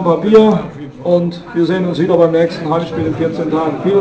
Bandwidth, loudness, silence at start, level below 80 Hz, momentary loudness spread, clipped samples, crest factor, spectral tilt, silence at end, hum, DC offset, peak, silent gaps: 8 kHz; -14 LUFS; 0 s; -46 dBFS; 10 LU; 0.3%; 14 dB; -8 dB/octave; 0 s; none; under 0.1%; 0 dBFS; none